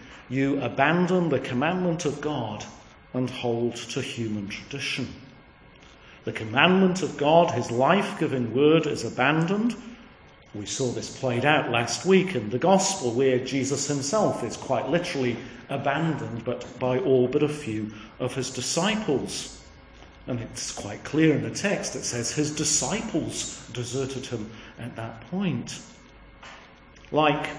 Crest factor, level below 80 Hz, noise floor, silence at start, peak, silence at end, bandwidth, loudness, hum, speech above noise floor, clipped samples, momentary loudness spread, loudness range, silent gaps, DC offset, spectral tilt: 22 dB; -56 dBFS; -51 dBFS; 0 s; -4 dBFS; 0 s; 10.5 kHz; -25 LUFS; none; 26 dB; under 0.1%; 14 LU; 8 LU; none; under 0.1%; -4.5 dB/octave